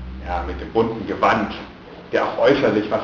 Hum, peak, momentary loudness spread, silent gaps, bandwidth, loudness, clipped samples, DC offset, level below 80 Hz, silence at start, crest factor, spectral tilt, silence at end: none; -4 dBFS; 14 LU; none; 7.2 kHz; -20 LUFS; under 0.1%; under 0.1%; -38 dBFS; 0 s; 18 dB; -6.5 dB/octave; 0 s